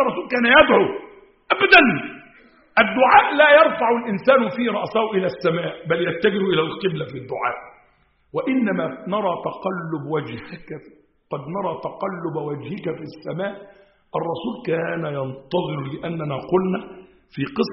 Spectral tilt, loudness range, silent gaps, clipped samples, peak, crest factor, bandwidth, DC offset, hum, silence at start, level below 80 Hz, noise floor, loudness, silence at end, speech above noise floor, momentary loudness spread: -3 dB/octave; 13 LU; none; under 0.1%; 0 dBFS; 20 dB; 5.8 kHz; under 0.1%; none; 0 s; -56 dBFS; -60 dBFS; -20 LUFS; 0 s; 40 dB; 18 LU